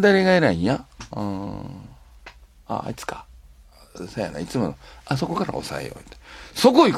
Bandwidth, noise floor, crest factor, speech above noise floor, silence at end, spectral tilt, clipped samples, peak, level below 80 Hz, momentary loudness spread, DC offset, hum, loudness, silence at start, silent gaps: 15.5 kHz; -49 dBFS; 22 dB; 27 dB; 0 s; -5.5 dB/octave; under 0.1%; -2 dBFS; -48 dBFS; 23 LU; under 0.1%; none; -23 LUFS; 0 s; none